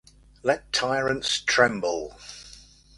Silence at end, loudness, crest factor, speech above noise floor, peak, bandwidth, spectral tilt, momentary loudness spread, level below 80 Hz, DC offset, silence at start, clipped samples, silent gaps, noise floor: 0.4 s; -24 LUFS; 22 dB; 25 dB; -4 dBFS; 11.5 kHz; -2.5 dB/octave; 20 LU; -54 dBFS; under 0.1%; 0.45 s; under 0.1%; none; -50 dBFS